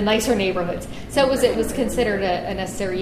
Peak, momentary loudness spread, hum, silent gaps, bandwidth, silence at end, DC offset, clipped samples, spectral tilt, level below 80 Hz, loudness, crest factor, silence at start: -4 dBFS; 8 LU; none; none; 15.5 kHz; 0 s; under 0.1%; under 0.1%; -4.5 dB/octave; -38 dBFS; -21 LUFS; 16 dB; 0 s